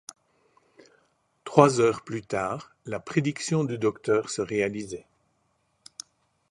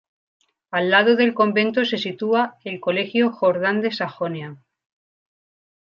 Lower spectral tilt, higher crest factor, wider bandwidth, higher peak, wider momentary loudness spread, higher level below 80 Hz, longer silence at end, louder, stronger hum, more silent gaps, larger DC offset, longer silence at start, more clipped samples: about the same, -5.5 dB/octave vs -6.5 dB/octave; first, 28 dB vs 20 dB; first, 11.5 kHz vs 7 kHz; about the same, 0 dBFS vs -2 dBFS; first, 23 LU vs 11 LU; first, -64 dBFS vs -74 dBFS; first, 1.5 s vs 1.3 s; second, -26 LUFS vs -20 LUFS; neither; neither; neither; first, 1.45 s vs 0.7 s; neither